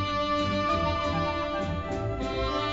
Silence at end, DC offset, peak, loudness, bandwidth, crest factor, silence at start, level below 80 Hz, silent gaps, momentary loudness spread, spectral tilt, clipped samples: 0 s; under 0.1%; -16 dBFS; -28 LUFS; 8 kHz; 12 dB; 0 s; -40 dBFS; none; 5 LU; -6 dB/octave; under 0.1%